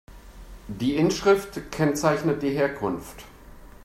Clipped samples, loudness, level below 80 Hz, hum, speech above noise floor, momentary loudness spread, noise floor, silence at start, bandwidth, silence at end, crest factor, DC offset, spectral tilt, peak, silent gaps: under 0.1%; -24 LUFS; -48 dBFS; none; 22 dB; 19 LU; -45 dBFS; 0.1 s; 16 kHz; 0.15 s; 18 dB; under 0.1%; -5.5 dB/octave; -8 dBFS; none